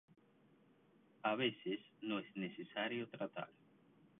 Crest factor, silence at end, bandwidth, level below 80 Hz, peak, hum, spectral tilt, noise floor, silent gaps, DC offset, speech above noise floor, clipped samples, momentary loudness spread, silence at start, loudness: 22 dB; 0.7 s; 3.9 kHz; -88 dBFS; -22 dBFS; none; -2 dB/octave; -71 dBFS; none; under 0.1%; 28 dB; under 0.1%; 9 LU; 1.25 s; -43 LUFS